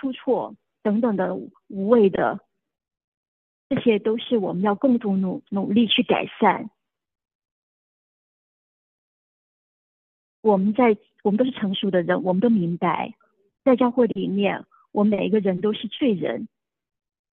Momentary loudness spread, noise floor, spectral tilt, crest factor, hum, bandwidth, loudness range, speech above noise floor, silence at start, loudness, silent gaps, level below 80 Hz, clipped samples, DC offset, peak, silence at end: 10 LU; under -90 dBFS; -10 dB/octave; 18 dB; none; 4.1 kHz; 4 LU; over 69 dB; 0.05 s; -22 LUFS; 3.04-3.70 s, 7.35-7.40 s, 7.51-10.43 s; -68 dBFS; under 0.1%; under 0.1%; -4 dBFS; 0.85 s